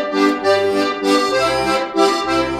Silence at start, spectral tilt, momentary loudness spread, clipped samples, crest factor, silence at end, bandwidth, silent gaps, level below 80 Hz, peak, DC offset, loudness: 0 s; -3.5 dB/octave; 3 LU; under 0.1%; 14 dB; 0 s; 15 kHz; none; -44 dBFS; -2 dBFS; under 0.1%; -16 LUFS